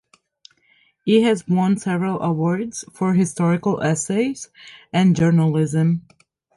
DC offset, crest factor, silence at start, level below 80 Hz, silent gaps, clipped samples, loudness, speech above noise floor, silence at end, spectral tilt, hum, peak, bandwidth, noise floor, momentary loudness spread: under 0.1%; 16 dB; 1.05 s; -58 dBFS; none; under 0.1%; -20 LUFS; 41 dB; 0.55 s; -6.5 dB/octave; none; -4 dBFS; 11.5 kHz; -60 dBFS; 9 LU